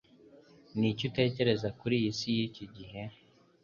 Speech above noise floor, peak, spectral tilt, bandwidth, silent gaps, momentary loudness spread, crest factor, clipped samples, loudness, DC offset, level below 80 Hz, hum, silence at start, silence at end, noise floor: 27 dB; -14 dBFS; -6 dB/octave; 7.2 kHz; none; 16 LU; 20 dB; under 0.1%; -32 LUFS; under 0.1%; -64 dBFS; none; 0.75 s; 0.5 s; -58 dBFS